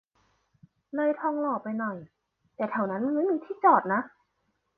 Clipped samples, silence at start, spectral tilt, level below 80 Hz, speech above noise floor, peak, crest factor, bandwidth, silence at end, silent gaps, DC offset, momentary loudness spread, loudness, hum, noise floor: under 0.1%; 0.95 s; -10 dB/octave; -78 dBFS; 49 dB; -8 dBFS; 22 dB; 4.4 kHz; 0.7 s; none; under 0.1%; 13 LU; -27 LUFS; none; -76 dBFS